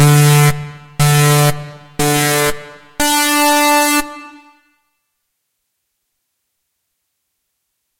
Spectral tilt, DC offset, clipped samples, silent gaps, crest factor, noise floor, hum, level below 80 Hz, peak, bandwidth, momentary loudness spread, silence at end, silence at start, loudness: -4 dB/octave; under 0.1%; under 0.1%; none; 16 dB; -72 dBFS; none; -42 dBFS; 0 dBFS; 16.5 kHz; 19 LU; 3.7 s; 0 s; -12 LUFS